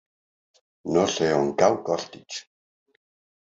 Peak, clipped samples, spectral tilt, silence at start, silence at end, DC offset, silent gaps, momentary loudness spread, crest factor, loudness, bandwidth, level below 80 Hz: -4 dBFS; under 0.1%; -4.5 dB/octave; 0.85 s; 1 s; under 0.1%; none; 16 LU; 22 dB; -23 LUFS; 8 kHz; -60 dBFS